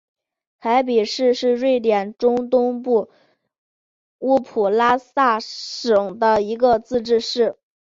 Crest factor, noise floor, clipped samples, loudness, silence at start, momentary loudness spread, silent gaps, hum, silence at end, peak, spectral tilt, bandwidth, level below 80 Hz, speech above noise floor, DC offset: 16 dB; under -90 dBFS; under 0.1%; -19 LUFS; 0.65 s; 5 LU; 3.58-4.19 s; none; 0.3 s; -4 dBFS; -4.5 dB/octave; 7.6 kHz; -58 dBFS; over 72 dB; under 0.1%